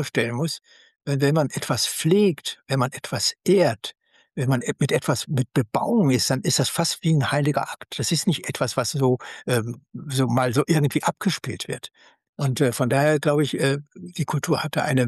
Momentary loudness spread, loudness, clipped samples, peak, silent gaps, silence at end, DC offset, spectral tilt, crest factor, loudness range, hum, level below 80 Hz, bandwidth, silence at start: 11 LU; -23 LUFS; under 0.1%; -8 dBFS; 12.29-12.33 s; 0 s; under 0.1%; -5 dB/octave; 16 dB; 2 LU; none; -60 dBFS; 12.5 kHz; 0 s